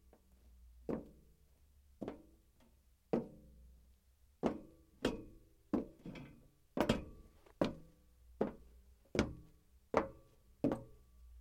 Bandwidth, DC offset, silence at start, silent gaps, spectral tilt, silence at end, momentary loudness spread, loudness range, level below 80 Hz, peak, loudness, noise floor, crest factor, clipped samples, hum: 16.5 kHz; under 0.1%; 0.45 s; none; -6 dB/octave; 0 s; 22 LU; 6 LU; -60 dBFS; -14 dBFS; -42 LUFS; -70 dBFS; 30 dB; under 0.1%; none